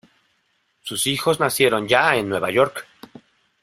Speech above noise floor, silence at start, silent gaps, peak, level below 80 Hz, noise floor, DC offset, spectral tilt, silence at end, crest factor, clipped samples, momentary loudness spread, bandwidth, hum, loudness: 48 dB; 0.85 s; none; 0 dBFS; -60 dBFS; -67 dBFS; under 0.1%; -3 dB/octave; 0.8 s; 22 dB; under 0.1%; 11 LU; 16 kHz; none; -19 LUFS